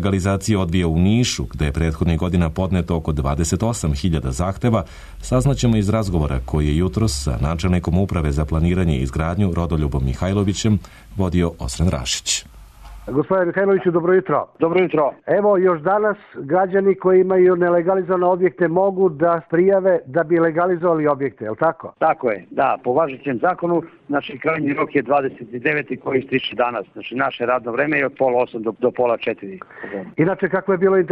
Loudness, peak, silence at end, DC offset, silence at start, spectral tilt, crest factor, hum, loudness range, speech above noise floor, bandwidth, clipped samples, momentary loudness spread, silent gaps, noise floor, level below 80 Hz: -19 LUFS; -6 dBFS; 0 s; under 0.1%; 0 s; -6 dB/octave; 14 dB; none; 4 LU; 21 dB; 13.5 kHz; under 0.1%; 6 LU; none; -39 dBFS; -32 dBFS